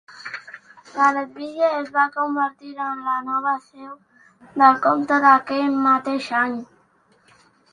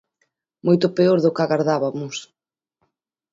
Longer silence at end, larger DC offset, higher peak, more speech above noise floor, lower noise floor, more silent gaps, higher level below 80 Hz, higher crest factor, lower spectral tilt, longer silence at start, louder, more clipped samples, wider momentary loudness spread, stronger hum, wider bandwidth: about the same, 1.1 s vs 1.1 s; neither; first, 0 dBFS vs -4 dBFS; second, 39 dB vs 55 dB; second, -59 dBFS vs -74 dBFS; neither; about the same, -70 dBFS vs -66 dBFS; about the same, 20 dB vs 18 dB; second, -4.5 dB/octave vs -6.5 dB/octave; second, 0.1 s vs 0.65 s; about the same, -20 LUFS vs -19 LUFS; neither; first, 19 LU vs 13 LU; neither; first, 10 kHz vs 7.8 kHz